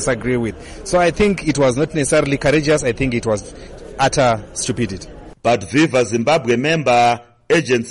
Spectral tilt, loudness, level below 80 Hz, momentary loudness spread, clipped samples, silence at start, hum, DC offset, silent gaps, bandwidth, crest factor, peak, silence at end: -5 dB/octave; -17 LUFS; -38 dBFS; 10 LU; under 0.1%; 0 s; none; 0.1%; none; 11.5 kHz; 12 dB; -4 dBFS; 0 s